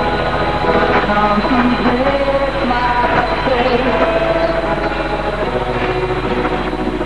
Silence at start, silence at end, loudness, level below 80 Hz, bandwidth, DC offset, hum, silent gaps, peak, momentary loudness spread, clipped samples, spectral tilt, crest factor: 0 s; 0 s; -15 LUFS; -28 dBFS; 11 kHz; 2%; none; none; 0 dBFS; 5 LU; under 0.1%; -6.5 dB/octave; 14 dB